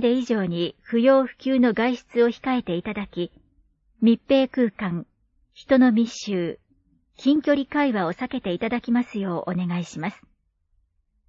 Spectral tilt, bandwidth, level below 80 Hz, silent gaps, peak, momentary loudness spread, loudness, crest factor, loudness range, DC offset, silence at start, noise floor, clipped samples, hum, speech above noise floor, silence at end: -6.5 dB/octave; 7.6 kHz; -58 dBFS; none; -6 dBFS; 12 LU; -23 LUFS; 16 dB; 3 LU; under 0.1%; 0 s; -67 dBFS; under 0.1%; none; 45 dB; 1.15 s